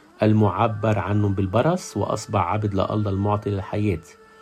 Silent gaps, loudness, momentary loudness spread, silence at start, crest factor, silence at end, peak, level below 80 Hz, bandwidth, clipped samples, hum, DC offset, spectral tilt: none; -23 LUFS; 7 LU; 0.2 s; 16 dB; 0.3 s; -6 dBFS; -54 dBFS; 10 kHz; under 0.1%; none; under 0.1%; -7.5 dB/octave